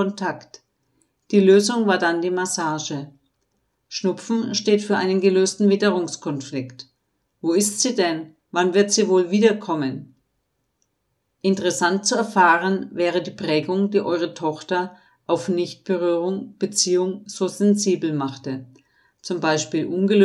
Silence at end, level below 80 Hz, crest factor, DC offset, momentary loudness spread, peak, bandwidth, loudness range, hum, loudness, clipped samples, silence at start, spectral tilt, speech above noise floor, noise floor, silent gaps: 0 s; -74 dBFS; 18 dB; under 0.1%; 12 LU; -2 dBFS; 13 kHz; 3 LU; none; -21 LUFS; under 0.1%; 0 s; -4 dB/octave; 53 dB; -73 dBFS; none